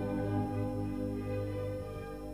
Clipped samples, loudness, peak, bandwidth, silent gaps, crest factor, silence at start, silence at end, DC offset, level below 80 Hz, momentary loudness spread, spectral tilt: under 0.1%; -37 LUFS; -22 dBFS; 14 kHz; none; 14 dB; 0 s; 0 s; under 0.1%; -50 dBFS; 7 LU; -8.5 dB/octave